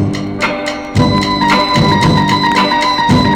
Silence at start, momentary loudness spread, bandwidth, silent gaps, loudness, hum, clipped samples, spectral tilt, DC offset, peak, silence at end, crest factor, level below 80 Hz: 0 s; 6 LU; 16 kHz; none; -12 LUFS; none; under 0.1%; -5.5 dB/octave; under 0.1%; -2 dBFS; 0 s; 10 dB; -32 dBFS